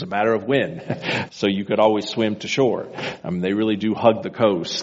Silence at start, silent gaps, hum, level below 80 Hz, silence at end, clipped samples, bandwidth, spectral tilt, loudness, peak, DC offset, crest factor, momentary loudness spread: 0 s; none; none; -60 dBFS; 0 s; under 0.1%; 8 kHz; -4 dB/octave; -21 LUFS; -2 dBFS; under 0.1%; 18 dB; 8 LU